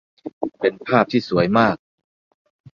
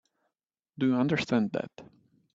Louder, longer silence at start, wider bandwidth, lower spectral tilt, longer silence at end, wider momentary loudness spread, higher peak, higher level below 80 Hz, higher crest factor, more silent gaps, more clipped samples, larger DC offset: first, -19 LUFS vs -29 LUFS; second, 0.25 s vs 0.8 s; about the same, 7.2 kHz vs 7.8 kHz; about the same, -7.5 dB/octave vs -7 dB/octave; first, 1.05 s vs 0.5 s; first, 13 LU vs 10 LU; first, -2 dBFS vs -12 dBFS; first, -56 dBFS vs -68 dBFS; about the same, 20 dB vs 20 dB; first, 0.33-0.41 s vs none; neither; neither